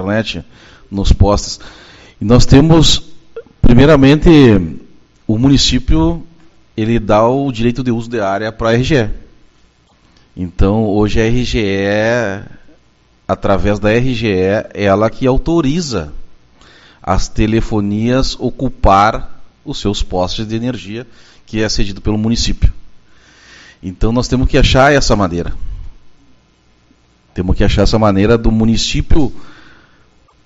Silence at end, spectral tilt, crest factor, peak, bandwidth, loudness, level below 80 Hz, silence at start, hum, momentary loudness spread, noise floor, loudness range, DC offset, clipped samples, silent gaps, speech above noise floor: 0.9 s; -6 dB/octave; 12 dB; 0 dBFS; 8 kHz; -13 LUFS; -22 dBFS; 0 s; none; 17 LU; -51 dBFS; 7 LU; under 0.1%; 0.3%; none; 40 dB